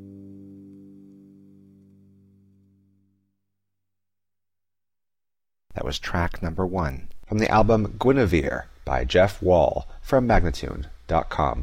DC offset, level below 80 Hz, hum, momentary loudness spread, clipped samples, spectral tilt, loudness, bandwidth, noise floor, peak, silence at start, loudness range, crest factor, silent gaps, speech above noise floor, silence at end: under 0.1%; -36 dBFS; none; 17 LU; under 0.1%; -6.5 dB/octave; -23 LUFS; 15.5 kHz; under -90 dBFS; -8 dBFS; 0 s; 12 LU; 18 dB; none; over 68 dB; 0 s